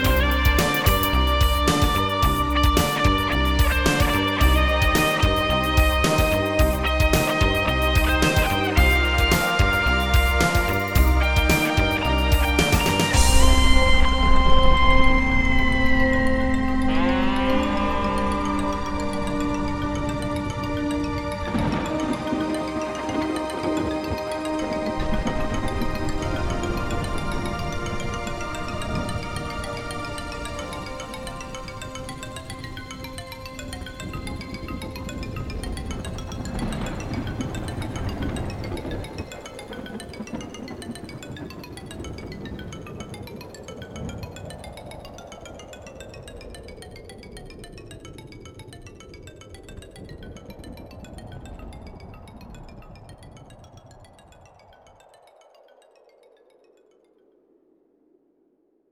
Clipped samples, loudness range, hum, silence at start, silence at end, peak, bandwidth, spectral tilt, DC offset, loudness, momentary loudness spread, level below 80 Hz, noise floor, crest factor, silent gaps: under 0.1%; 22 LU; none; 0 s; 5.15 s; -2 dBFS; over 20 kHz; -5 dB/octave; under 0.1%; -22 LUFS; 22 LU; -28 dBFS; -65 dBFS; 20 dB; none